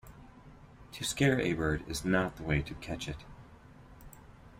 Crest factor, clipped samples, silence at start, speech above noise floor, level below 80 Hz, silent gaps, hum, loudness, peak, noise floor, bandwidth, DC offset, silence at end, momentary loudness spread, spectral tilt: 20 dB; under 0.1%; 0.05 s; 22 dB; -50 dBFS; none; none; -32 LUFS; -14 dBFS; -54 dBFS; 16 kHz; under 0.1%; 0.1 s; 26 LU; -5 dB/octave